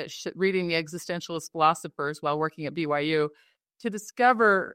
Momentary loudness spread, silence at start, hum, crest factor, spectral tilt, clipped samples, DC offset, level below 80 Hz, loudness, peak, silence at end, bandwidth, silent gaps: 12 LU; 0 s; none; 20 dB; -4.5 dB/octave; under 0.1%; under 0.1%; -74 dBFS; -27 LUFS; -8 dBFS; 0 s; 16 kHz; none